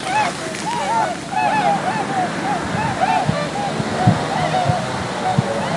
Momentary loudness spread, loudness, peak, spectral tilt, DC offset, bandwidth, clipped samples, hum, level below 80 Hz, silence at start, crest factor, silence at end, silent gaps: 5 LU; -19 LUFS; 0 dBFS; -5 dB/octave; under 0.1%; 11.5 kHz; under 0.1%; none; -48 dBFS; 0 s; 18 dB; 0 s; none